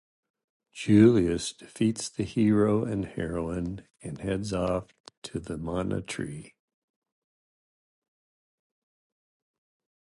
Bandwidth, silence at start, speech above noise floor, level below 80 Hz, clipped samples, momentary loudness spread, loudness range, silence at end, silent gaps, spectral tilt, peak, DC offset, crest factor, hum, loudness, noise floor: 11.5 kHz; 0.75 s; over 63 dB; -52 dBFS; under 0.1%; 18 LU; 13 LU; 3.65 s; 5.00-5.04 s, 5.17-5.22 s; -6.5 dB/octave; -6 dBFS; under 0.1%; 22 dB; none; -27 LUFS; under -90 dBFS